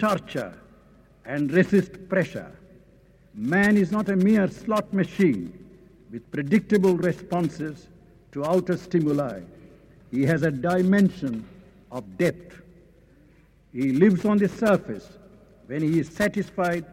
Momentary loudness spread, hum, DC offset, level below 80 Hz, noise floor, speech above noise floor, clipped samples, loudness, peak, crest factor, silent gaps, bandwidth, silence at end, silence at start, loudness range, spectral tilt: 18 LU; none; under 0.1%; -56 dBFS; -56 dBFS; 33 dB; under 0.1%; -24 LUFS; -6 dBFS; 18 dB; none; 15.5 kHz; 0.1 s; 0 s; 3 LU; -7.5 dB/octave